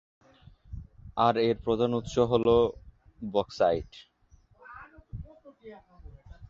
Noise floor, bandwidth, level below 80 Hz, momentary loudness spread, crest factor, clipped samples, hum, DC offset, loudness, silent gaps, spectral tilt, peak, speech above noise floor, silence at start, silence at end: -61 dBFS; 7.4 kHz; -50 dBFS; 25 LU; 20 dB; under 0.1%; none; under 0.1%; -27 LUFS; none; -6.5 dB/octave; -10 dBFS; 35 dB; 0.7 s; 0.05 s